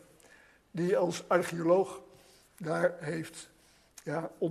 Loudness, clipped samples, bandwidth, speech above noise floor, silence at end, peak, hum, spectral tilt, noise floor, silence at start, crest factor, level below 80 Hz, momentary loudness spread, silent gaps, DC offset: -31 LUFS; under 0.1%; 13.5 kHz; 30 dB; 0 s; -12 dBFS; none; -6 dB/octave; -60 dBFS; 0.75 s; 20 dB; -72 dBFS; 18 LU; none; under 0.1%